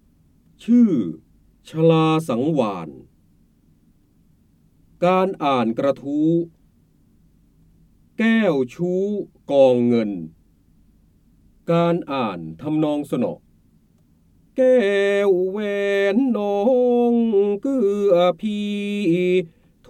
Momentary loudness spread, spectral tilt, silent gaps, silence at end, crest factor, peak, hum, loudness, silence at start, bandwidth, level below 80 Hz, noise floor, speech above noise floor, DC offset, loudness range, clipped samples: 14 LU; -7.5 dB/octave; none; 0.4 s; 18 dB; -4 dBFS; none; -20 LUFS; 0.6 s; 12.5 kHz; -60 dBFS; -57 dBFS; 39 dB; under 0.1%; 6 LU; under 0.1%